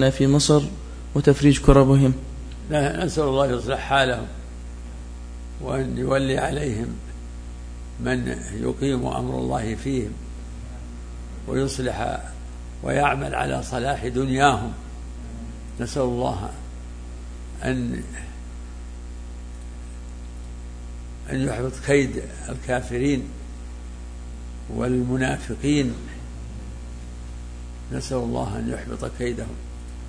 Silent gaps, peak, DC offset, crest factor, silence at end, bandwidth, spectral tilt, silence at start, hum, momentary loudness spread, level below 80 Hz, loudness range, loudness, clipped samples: none; 0 dBFS; under 0.1%; 24 dB; 0 s; 10.5 kHz; -6 dB/octave; 0 s; 60 Hz at -35 dBFS; 19 LU; -34 dBFS; 11 LU; -23 LUFS; under 0.1%